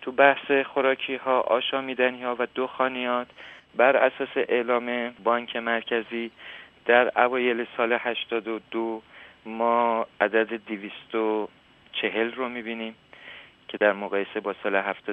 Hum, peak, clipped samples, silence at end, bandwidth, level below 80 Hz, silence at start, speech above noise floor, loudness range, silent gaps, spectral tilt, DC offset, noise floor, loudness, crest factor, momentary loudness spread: none; -2 dBFS; under 0.1%; 0 s; 4.3 kHz; -72 dBFS; 0 s; 22 dB; 4 LU; none; -6.5 dB/octave; under 0.1%; -47 dBFS; -25 LUFS; 24 dB; 15 LU